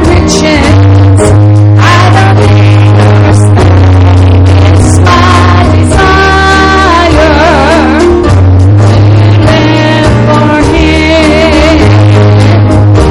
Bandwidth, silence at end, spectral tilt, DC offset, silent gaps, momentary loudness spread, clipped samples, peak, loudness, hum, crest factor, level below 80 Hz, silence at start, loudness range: 11.5 kHz; 0 s; -6.5 dB/octave; under 0.1%; none; 2 LU; 2%; 0 dBFS; -4 LUFS; none; 2 dB; -16 dBFS; 0 s; 1 LU